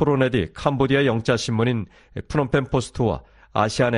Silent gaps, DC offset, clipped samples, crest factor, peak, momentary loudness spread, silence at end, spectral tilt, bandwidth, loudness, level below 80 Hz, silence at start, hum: none; under 0.1%; under 0.1%; 18 dB; -4 dBFS; 9 LU; 0 s; -6 dB/octave; 11 kHz; -22 LUFS; -42 dBFS; 0 s; none